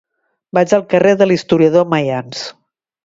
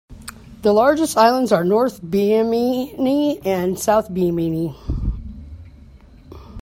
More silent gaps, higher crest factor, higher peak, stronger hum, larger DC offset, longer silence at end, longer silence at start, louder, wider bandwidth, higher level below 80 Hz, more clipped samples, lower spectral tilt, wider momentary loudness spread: neither; about the same, 14 dB vs 18 dB; about the same, 0 dBFS vs -2 dBFS; neither; neither; first, 0.55 s vs 0 s; first, 0.55 s vs 0.1 s; first, -13 LUFS vs -18 LUFS; second, 7.8 kHz vs 16.5 kHz; second, -56 dBFS vs -36 dBFS; neither; about the same, -6 dB/octave vs -6 dB/octave; second, 14 LU vs 21 LU